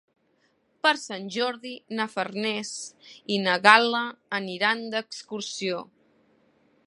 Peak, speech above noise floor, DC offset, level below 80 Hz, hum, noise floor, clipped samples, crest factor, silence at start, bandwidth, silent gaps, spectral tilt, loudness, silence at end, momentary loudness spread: 0 dBFS; 42 dB; under 0.1%; -80 dBFS; none; -68 dBFS; under 0.1%; 26 dB; 0.85 s; 11.5 kHz; none; -3 dB/octave; -25 LUFS; 1.05 s; 18 LU